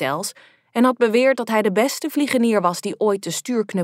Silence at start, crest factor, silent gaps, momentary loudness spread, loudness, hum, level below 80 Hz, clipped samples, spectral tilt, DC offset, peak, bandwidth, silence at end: 0 s; 16 dB; none; 7 LU; -20 LUFS; none; -78 dBFS; under 0.1%; -4.5 dB/octave; under 0.1%; -4 dBFS; 16 kHz; 0 s